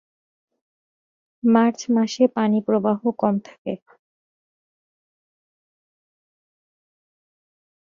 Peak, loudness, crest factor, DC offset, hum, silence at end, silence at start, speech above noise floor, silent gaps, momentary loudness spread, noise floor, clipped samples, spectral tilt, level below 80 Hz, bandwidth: -4 dBFS; -20 LUFS; 22 dB; under 0.1%; none; 4.15 s; 1.45 s; over 70 dB; 3.58-3.65 s; 14 LU; under -90 dBFS; under 0.1%; -6.5 dB/octave; -70 dBFS; 7.4 kHz